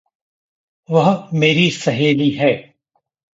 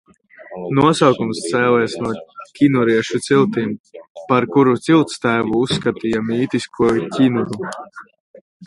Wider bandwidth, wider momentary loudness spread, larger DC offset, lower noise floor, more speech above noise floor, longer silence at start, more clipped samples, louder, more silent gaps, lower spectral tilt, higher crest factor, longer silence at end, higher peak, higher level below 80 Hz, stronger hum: second, 8 kHz vs 11.5 kHz; second, 5 LU vs 15 LU; neither; first, -69 dBFS vs -40 dBFS; first, 54 dB vs 23 dB; first, 0.9 s vs 0.4 s; neither; about the same, -16 LUFS vs -17 LUFS; second, none vs 3.80-3.84 s, 4.10-4.15 s, 8.20-8.34 s, 8.41-8.60 s; about the same, -6 dB/octave vs -6 dB/octave; about the same, 16 dB vs 18 dB; first, 0.7 s vs 0 s; about the same, -2 dBFS vs 0 dBFS; second, -60 dBFS vs -54 dBFS; neither